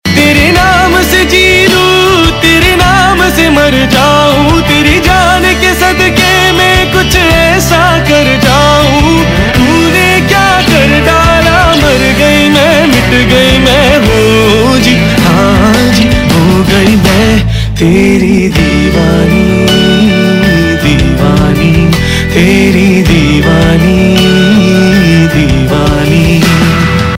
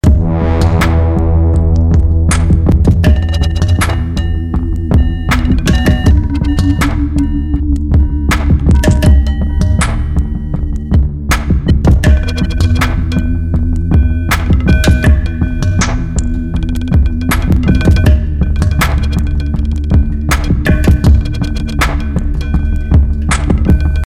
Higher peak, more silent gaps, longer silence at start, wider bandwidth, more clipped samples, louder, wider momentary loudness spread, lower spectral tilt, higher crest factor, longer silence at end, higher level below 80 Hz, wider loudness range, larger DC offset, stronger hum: about the same, 0 dBFS vs 0 dBFS; neither; about the same, 0.05 s vs 0.05 s; about the same, 16.5 kHz vs 16 kHz; first, 3% vs under 0.1%; first, -6 LUFS vs -12 LUFS; second, 3 LU vs 6 LU; second, -5 dB/octave vs -6.5 dB/octave; about the same, 6 dB vs 10 dB; about the same, 0 s vs 0 s; second, -18 dBFS vs -12 dBFS; about the same, 2 LU vs 2 LU; neither; neither